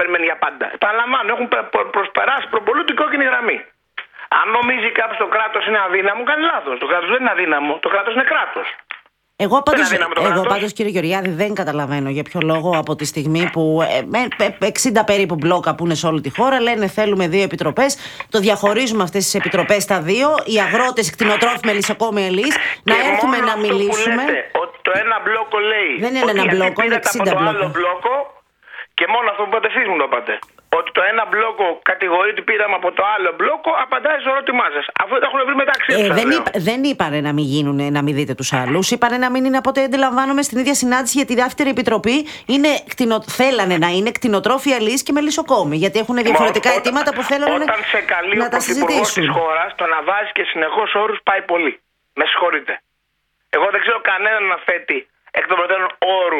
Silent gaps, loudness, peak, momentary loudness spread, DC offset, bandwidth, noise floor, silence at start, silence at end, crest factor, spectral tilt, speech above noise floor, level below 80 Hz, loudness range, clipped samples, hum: none; -16 LUFS; 0 dBFS; 5 LU; under 0.1%; 18 kHz; -69 dBFS; 0 s; 0 s; 16 dB; -4 dB/octave; 52 dB; -56 dBFS; 2 LU; under 0.1%; none